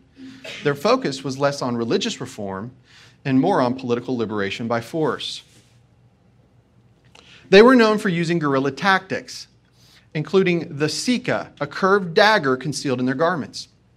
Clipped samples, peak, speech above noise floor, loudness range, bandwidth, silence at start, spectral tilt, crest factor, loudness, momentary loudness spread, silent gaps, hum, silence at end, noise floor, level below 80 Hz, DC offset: under 0.1%; 0 dBFS; 36 dB; 6 LU; 13.5 kHz; 0.2 s; -5 dB/octave; 20 dB; -20 LUFS; 15 LU; none; none; 0.3 s; -56 dBFS; -60 dBFS; under 0.1%